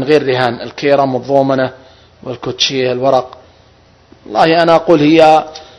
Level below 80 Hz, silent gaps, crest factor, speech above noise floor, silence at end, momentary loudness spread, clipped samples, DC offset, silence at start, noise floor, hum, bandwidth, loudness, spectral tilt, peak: -50 dBFS; none; 12 dB; 35 dB; 0.15 s; 14 LU; 0.6%; under 0.1%; 0 s; -46 dBFS; none; 11 kHz; -12 LUFS; -5.5 dB/octave; 0 dBFS